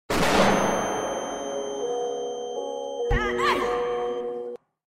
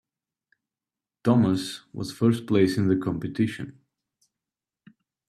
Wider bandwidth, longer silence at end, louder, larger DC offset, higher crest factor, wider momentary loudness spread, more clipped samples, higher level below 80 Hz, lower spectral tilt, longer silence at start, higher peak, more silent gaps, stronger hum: first, 16 kHz vs 13.5 kHz; second, 0.3 s vs 1.55 s; about the same, -26 LUFS vs -25 LUFS; neither; about the same, 18 dB vs 20 dB; about the same, 11 LU vs 13 LU; neither; first, -40 dBFS vs -62 dBFS; second, -4 dB/octave vs -7 dB/octave; second, 0.1 s vs 1.25 s; about the same, -8 dBFS vs -6 dBFS; neither; neither